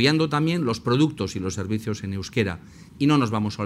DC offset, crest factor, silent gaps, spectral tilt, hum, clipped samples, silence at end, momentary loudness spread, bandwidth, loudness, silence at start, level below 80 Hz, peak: under 0.1%; 18 dB; none; -6 dB/octave; none; under 0.1%; 0 s; 8 LU; 14.5 kHz; -24 LUFS; 0 s; -54 dBFS; -6 dBFS